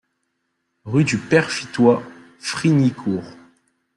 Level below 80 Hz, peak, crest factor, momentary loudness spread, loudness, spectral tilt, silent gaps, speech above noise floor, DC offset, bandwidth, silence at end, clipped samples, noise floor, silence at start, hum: -60 dBFS; -2 dBFS; 18 dB; 10 LU; -19 LUFS; -6 dB/octave; none; 55 dB; under 0.1%; 11.5 kHz; 0.65 s; under 0.1%; -73 dBFS; 0.85 s; none